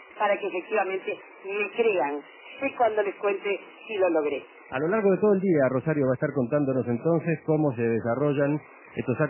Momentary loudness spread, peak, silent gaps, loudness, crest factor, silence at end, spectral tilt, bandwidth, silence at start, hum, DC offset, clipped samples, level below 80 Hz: 11 LU; -10 dBFS; none; -26 LUFS; 16 dB; 0 s; -11 dB/octave; 3.2 kHz; 0 s; none; under 0.1%; under 0.1%; -66 dBFS